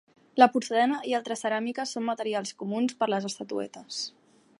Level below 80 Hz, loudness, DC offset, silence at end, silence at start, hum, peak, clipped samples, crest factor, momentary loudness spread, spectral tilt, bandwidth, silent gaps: -84 dBFS; -28 LUFS; under 0.1%; 0.5 s; 0.35 s; none; -4 dBFS; under 0.1%; 24 dB; 13 LU; -4 dB/octave; 11.5 kHz; none